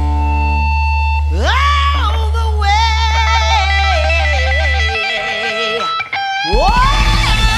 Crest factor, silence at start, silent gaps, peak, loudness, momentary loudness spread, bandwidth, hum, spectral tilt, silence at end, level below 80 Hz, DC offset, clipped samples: 12 dB; 0 s; none; 0 dBFS; -14 LUFS; 4 LU; 11.5 kHz; none; -4 dB/octave; 0 s; -16 dBFS; under 0.1%; under 0.1%